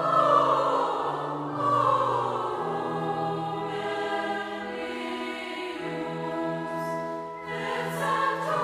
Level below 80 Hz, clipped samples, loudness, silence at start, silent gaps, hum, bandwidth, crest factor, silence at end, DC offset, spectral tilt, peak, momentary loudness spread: -66 dBFS; under 0.1%; -28 LUFS; 0 s; none; none; 15.5 kHz; 18 dB; 0 s; under 0.1%; -5.5 dB/octave; -10 dBFS; 10 LU